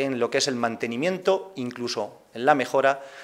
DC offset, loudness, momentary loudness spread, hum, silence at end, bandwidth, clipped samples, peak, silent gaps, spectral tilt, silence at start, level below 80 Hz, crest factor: under 0.1%; -25 LUFS; 10 LU; none; 0 s; 16 kHz; under 0.1%; -2 dBFS; none; -4 dB/octave; 0 s; -74 dBFS; 22 dB